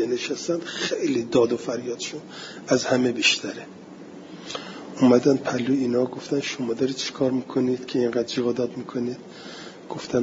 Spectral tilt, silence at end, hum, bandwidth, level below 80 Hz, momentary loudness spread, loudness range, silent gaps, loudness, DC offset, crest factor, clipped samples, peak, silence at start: -4.5 dB/octave; 0 s; none; 7.8 kHz; -66 dBFS; 19 LU; 3 LU; none; -24 LUFS; under 0.1%; 20 dB; under 0.1%; -4 dBFS; 0 s